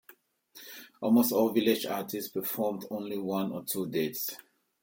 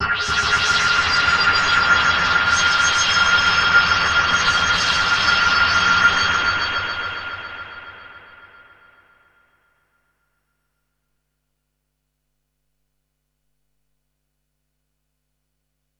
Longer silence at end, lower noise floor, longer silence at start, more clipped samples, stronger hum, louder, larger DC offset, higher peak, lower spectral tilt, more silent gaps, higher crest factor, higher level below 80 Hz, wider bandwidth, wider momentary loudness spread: second, 0.45 s vs 7.8 s; second, -60 dBFS vs -74 dBFS; first, 0.55 s vs 0 s; neither; neither; second, -30 LUFS vs -16 LUFS; neither; second, -12 dBFS vs -2 dBFS; first, -4.5 dB/octave vs -1 dB/octave; neither; about the same, 18 dB vs 18 dB; second, -76 dBFS vs -44 dBFS; first, 17 kHz vs 11 kHz; first, 20 LU vs 11 LU